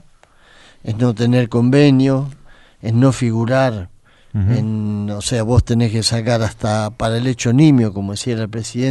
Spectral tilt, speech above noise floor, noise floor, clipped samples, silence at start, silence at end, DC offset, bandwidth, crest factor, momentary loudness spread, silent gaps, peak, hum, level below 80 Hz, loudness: -6.5 dB/octave; 33 dB; -48 dBFS; under 0.1%; 0.85 s; 0 s; under 0.1%; 11.5 kHz; 14 dB; 11 LU; none; -2 dBFS; none; -38 dBFS; -16 LUFS